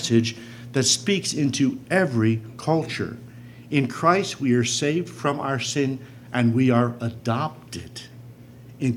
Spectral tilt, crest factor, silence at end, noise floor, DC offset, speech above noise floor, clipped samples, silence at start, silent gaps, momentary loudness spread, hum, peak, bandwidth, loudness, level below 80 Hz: -4.5 dB/octave; 20 dB; 0 s; -44 dBFS; under 0.1%; 21 dB; under 0.1%; 0 s; none; 16 LU; none; -4 dBFS; 15 kHz; -23 LUFS; -62 dBFS